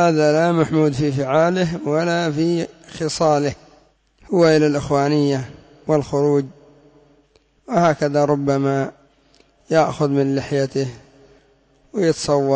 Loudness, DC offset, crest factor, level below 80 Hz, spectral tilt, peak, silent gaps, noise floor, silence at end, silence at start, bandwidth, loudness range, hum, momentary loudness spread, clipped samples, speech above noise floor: -19 LUFS; under 0.1%; 14 dB; -52 dBFS; -6.5 dB/octave; -6 dBFS; none; -58 dBFS; 0 s; 0 s; 8 kHz; 3 LU; none; 10 LU; under 0.1%; 40 dB